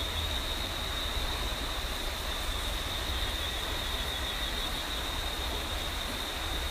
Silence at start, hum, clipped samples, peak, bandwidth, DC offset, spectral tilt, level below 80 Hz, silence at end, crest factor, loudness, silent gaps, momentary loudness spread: 0 s; none; under 0.1%; -20 dBFS; 15.5 kHz; under 0.1%; -2.5 dB/octave; -38 dBFS; 0 s; 14 dB; -33 LUFS; none; 2 LU